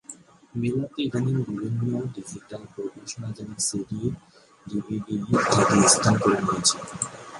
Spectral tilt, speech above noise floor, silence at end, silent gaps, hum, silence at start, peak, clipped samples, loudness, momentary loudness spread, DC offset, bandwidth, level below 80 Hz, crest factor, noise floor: -4 dB/octave; 22 dB; 0 s; none; none; 0.1 s; -4 dBFS; under 0.1%; -24 LUFS; 19 LU; under 0.1%; 11.5 kHz; -54 dBFS; 22 dB; -47 dBFS